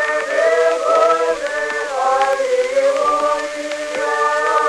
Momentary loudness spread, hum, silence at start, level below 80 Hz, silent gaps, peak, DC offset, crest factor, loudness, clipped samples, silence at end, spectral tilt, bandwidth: 7 LU; none; 0 s; -56 dBFS; none; -2 dBFS; under 0.1%; 14 dB; -17 LUFS; under 0.1%; 0 s; -1 dB/octave; 13 kHz